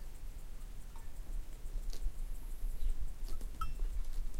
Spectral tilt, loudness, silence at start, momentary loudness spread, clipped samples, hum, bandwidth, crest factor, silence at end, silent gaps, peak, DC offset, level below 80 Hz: -5 dB/octave; -47 LUFS; 0 s; 9 LU; under 0.1%; none; 15.5 kHz; 12 dB; 0 s; none; -24 dBFS; under 0.1%; -38 dBFS